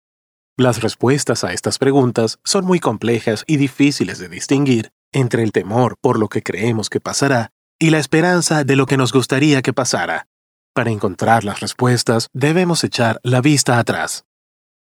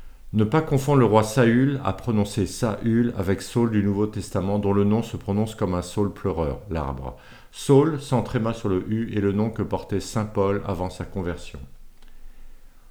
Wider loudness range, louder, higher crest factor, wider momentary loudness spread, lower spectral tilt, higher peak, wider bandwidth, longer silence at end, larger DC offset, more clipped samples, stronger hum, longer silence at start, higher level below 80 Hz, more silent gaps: second, 2 LU vs 5 LU; first, -17 LUFS vs -23 LUFS; about the same, 16 dB vs 20 dB; second, 7 LU vs 12 LU; second, -5 dB/octave vs -7 dB/octave; about the same, -2 dBFS vs -2 dBFS; second, 17.5 kHz vs 20 kHz; first, 0.7 s vs 0.1 s; neither; neither; neither; first, 0.6 s vs 0 s; second, -58 dBFS vs -42 dBFS; first, 4.92-5.12 s, 7.52-7.79 s, 10.26-10.74 s vs none